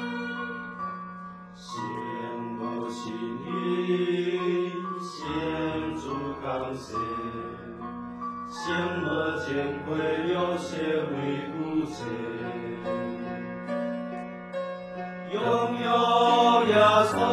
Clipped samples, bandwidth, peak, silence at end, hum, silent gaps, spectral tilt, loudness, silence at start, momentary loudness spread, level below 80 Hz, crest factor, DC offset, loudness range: under 0.1%; 13 kHz; -6 dBFS; 0 s; none; none; -5.5 dB/octave; -28 LUFS; 0 s; 15 LU; -58 dBFS; 22 dB; under 0.1%; 8 LU